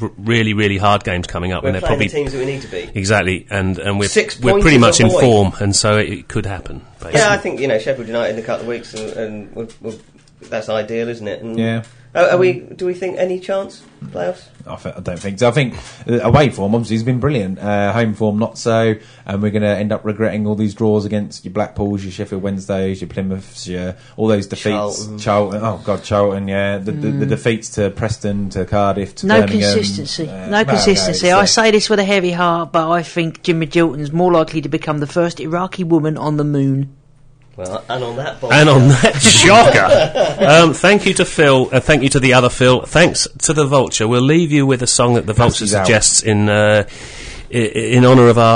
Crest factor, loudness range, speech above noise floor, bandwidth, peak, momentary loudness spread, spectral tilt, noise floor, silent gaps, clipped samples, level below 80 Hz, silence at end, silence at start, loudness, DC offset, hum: 14 dB; 10 LU; 31 dB; 10.5 kHz; 0 dBFS; 15 LU; -4.5 dB/octave; -45 dBFS; none; under 0.1%; -36 dBFS; 0 s; 0 s; -14 LUFS; under 0.1%; none